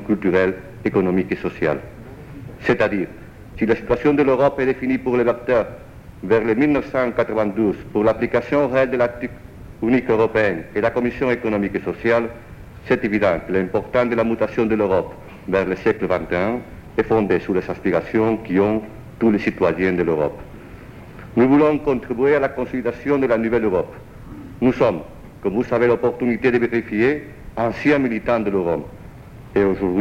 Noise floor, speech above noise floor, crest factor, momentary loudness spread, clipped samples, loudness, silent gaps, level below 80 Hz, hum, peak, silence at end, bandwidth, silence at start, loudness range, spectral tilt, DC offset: -39 dBFS; 20 dB; 14 dB; 15 LU; under 0.1%; -20 LUFS; none; -44 dBFS; none; -4 dBFS; 0 s; 15 kHz; 0 s; 2 LU; -8 dB/octave; under 0.1%